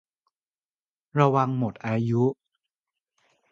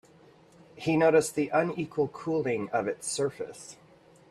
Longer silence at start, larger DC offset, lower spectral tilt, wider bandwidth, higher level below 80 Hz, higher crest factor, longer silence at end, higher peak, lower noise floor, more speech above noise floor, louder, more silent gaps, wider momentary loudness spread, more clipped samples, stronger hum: first, 1.15 s vs 0.75 s; neither; first, -9 dB/octave vs -5 dB/octave; second, 7.2 kHz vs 14 kHz; about the same, -66 dBFS vs -68 dBFS; about the same, 22 dB vs 18 dB; first, 1.2 s vs 0.55 s; first, -4 dBFS vs -12 dBFS; first, under -90 dBFS vs -57 dBFS; first, over 67 dB vs 29 dB; first, -25 LUFS vs -28 LUFS; neither; second, 8 LU vs 17 LU; neither; neither